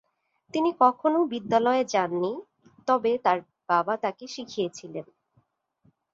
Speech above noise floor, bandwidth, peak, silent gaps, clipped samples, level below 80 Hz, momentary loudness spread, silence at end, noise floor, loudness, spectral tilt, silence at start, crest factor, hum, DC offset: 44 dB; 7.8 kHz; -6 dBFS; none; under 0.1%; -74 dBFS; 15 LU; 1.1 s; -69 dBFS; -26 LUFS; -5 dB/octave; 0.55 s; 20 dB; none; under 0.1%